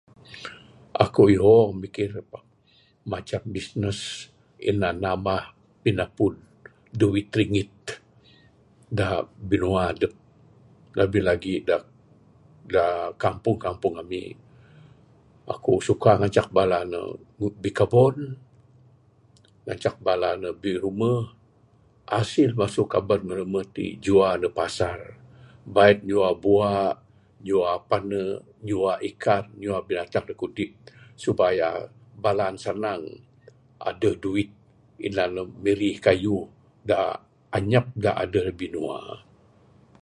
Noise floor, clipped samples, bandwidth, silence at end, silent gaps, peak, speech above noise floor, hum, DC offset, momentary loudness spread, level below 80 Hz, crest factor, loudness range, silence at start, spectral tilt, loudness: -60 dBFS; under 0.1%; 11 kHz; 0.85 s; none; -2 dBFS; 37 dB; none; under 0.1%; 16 LU; -50 dBFS; 24 dB; 6 LU; 0.3 s; -6.5 dB/octave; -24 LUFS